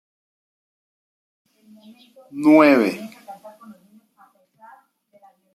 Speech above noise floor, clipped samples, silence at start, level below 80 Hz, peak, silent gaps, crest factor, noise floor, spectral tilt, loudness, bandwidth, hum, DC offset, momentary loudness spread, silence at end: 40 dB; under 0.1%; 2.35 s; -76 dBFS; -2 dBFS; none; 20 dB; -57 dBFS; -6 dB/octave; -15 LUFS; 13 kHz; none; under 0.1%; 28 LU; 2.05 s